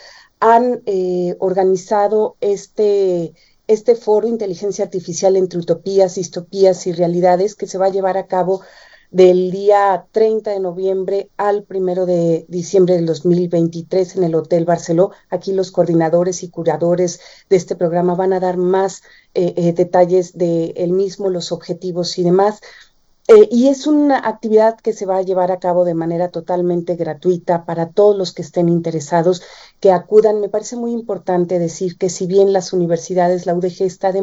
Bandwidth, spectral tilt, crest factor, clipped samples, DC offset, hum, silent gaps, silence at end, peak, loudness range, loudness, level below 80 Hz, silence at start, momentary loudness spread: 8 kHz; -6.5 dB/octave; 16 dB; under 0.1%; under 0.1%; none; none; 0 s; 0 dBFS; 3 LU; -16 LUFS; -60 dBFS; 0.4 s; 8 LU